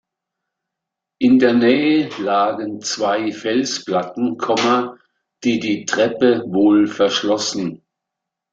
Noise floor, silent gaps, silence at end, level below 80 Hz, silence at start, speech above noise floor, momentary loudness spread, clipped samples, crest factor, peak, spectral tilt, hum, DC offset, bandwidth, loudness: -83 dBFS; none; 0.75 s; -62 dBFS; 1.2 s; 66 dB; 9 LU; under 0.1%; 16 dB; -2 dBFS; -4 dB/octave; none; under 0.1%; 8 kHz; -18 LUFS